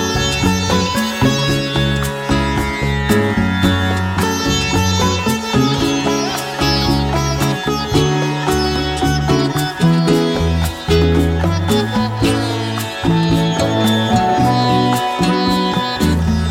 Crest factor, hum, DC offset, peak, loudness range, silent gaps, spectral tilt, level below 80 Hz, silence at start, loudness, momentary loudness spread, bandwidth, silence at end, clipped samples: 16 dB; none; under 0.1%; 0 dBFS; 1 LU; none; -5 dB/octave; -28 dBFS; 0 s; -16 LUFS; 4 LU; 17 kHz; 0 s; under 0.1%